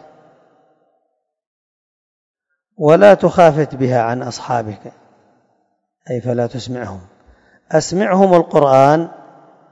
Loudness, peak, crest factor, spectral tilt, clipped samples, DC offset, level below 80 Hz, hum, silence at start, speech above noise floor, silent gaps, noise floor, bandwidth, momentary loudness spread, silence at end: -14 LUFS; 0 dBFS; 16 dB; -6.5 dB/octave; 0.4%; under 0.1%; -54 dBFS; none; 2.8 s; 57 dB; none; -70 dBFS; 9.8 kHz; 17 LU; 0.55 s